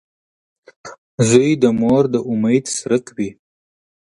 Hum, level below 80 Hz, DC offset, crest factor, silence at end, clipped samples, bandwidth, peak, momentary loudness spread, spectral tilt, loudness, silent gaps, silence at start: none; -54 dBFS; under 0.1%; 18 dB; 0.75 s; under 0.1%; 11.5 kHz; 0 dBFS; 13 LU; -5.5 dB/octave; -17 LUFS; 0.98-1.18 s; 0.85 s